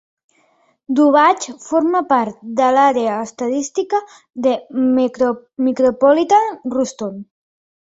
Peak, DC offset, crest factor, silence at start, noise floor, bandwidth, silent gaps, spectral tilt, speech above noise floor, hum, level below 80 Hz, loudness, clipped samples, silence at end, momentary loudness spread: -2 dBFS; under 0.1%; 16 dB; 0.9 s; -58 dBFS; 8 kHz; none; -4.5 dB/octave; 42 dB; none; -62 dBFS; -16 LUFS; under 0.1%; 0.6 s; 9 LU